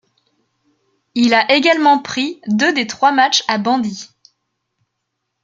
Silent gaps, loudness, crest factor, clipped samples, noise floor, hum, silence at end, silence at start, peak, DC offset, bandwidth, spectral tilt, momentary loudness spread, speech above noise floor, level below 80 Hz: none; -15 LUFS; 16 dB; under 0.1%; -75 dBFS; none; 1.4 s; 1.15 s; 0 dBFS; under 0.1%; 7.8 kHz; -3 dB/octave; 10 LU; 60 dB; -64 dBFS